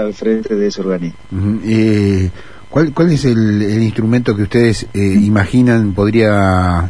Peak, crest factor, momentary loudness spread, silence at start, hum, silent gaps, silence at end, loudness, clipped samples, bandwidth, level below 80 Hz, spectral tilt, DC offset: 0 dBFS; 12 dB; 7 LU; 0 s; none; none; 0 s; -13 LUFS; under 0.1%; 10.5 kHz; -36 dBFS; -7.5 dB/octave; 2%